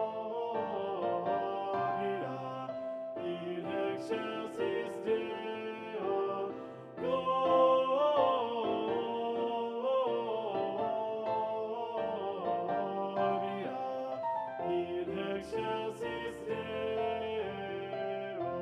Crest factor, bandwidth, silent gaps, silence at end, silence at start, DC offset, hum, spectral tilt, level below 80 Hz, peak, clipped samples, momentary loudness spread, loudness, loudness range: 18 dB; 11 kHz; none; 0 s; 0 s; under 0.1%; none; -6.5 dB/octave; -72 dBFS; -16 dBFS; under 0.1%; 9 LU; -35 LUFS; 6 LU